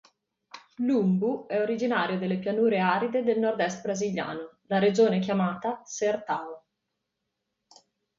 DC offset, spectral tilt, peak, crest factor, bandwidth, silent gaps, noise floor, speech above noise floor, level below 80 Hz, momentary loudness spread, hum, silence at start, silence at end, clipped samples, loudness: under 0.1%; -6 dB/octave; -10 dBFS; 18 dB; 7.6 kHz; none; -82 dBFS; 56 dB; -72 dBFS; 10 LU; none; 0.55 s; 1.6 s; under 0.1%; -27 LUFS